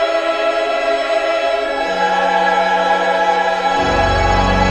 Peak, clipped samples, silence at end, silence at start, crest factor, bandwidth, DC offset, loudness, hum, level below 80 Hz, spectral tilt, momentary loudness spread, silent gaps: -2 dBFS; under 0.1%; 0 s; 0 s; 12 dB; 10.5 kHz; under 0.1%; -15 LUFS; none; -28 dBFS; -4.5 dB/octave; 3 LU; none